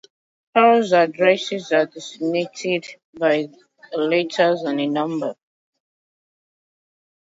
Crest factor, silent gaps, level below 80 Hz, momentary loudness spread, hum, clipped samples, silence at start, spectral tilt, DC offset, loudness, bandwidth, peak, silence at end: 18 dB; 3.04-3.13 s; -74 dBFS; 12 LU; none; under 0.1%; 0.55 s; -5 dB/octave; under 0.1%; -20 LUFS; 8 kHz; -2 dBFS; 1.95 s